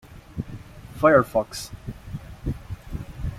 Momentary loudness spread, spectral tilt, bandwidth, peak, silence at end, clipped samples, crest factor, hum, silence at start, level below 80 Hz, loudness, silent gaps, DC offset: 21 LU; -6 dB/octave; 16 kHz; -4 dBFS; 0 s; under 0.1%; 22 dB; none; 0.1 s; -40 dBFS; -23 LUFS; none; under 0.1%